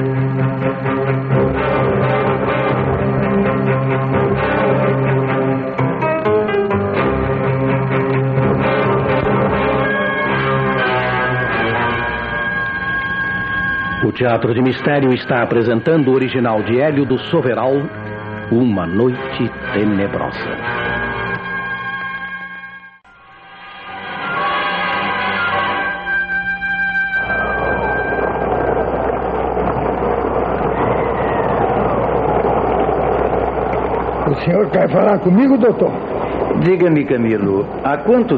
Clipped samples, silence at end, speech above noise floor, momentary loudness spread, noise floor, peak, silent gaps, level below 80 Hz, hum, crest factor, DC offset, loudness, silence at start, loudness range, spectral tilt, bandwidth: under 0.1%; 0 s; 29 dB; 6 LU; -43 dBFS; -2 dBFS; none; -36 dBFS; none; 14 dB; under 0.1%; -16 LUFS; 0 s; 5 LU; -9.5 dB/octave; 5.2 kHz